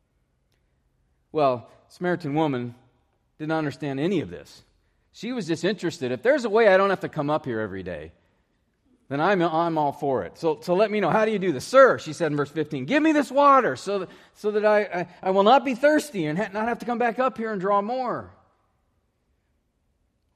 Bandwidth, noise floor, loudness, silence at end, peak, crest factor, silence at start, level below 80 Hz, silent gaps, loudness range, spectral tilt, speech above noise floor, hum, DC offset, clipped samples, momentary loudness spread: 14 kHz; -71 dBFS; -23 LUFS; 2.05 s; -4 dBFS; 20 dB; 1.35 s; -66 dBFS; none; 8 LU; -6 dB/octave; 48 dB; none; under 0.1%; under 0.1%; 14 LU